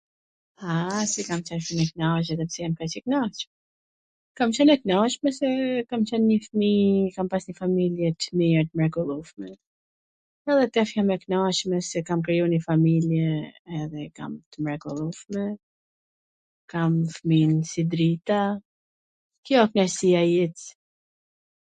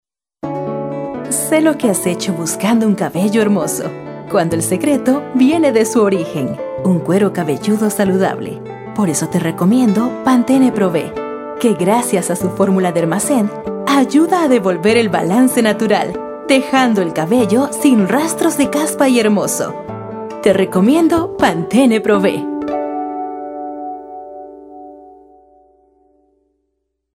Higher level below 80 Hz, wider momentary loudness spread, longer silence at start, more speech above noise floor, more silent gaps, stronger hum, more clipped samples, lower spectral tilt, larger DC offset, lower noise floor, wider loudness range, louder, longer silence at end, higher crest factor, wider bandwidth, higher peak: second, -62 dBFS vs -52 dBFS; about the same, 14 LU vs 13 LU; first, 0.6 s vs 0.45 s; first, over 66 dB vs 57 dB; first, 3.47-4.35 s, 9.66-10.45 s, 13.59-13.65 s, 14.46-14.52 s, 15.63-16.68 s, 18.65-19.30 s, 19.38-19.43 s vs none; neither; neither; about the same, -6 dB/octave vs -5 dB/octave; neither; first, under -90 dBFS vs -71 dBFS; about the same, 5 LU vs 4 LU; second, -24 LUFS vs -15 LUFS; second, 1.05 s vs 2.05 s; first, 20 dB vs 14 dB; second, 9.4 kHz vs 16.5 kHz; second, -4 dBFS vs 0 dBFS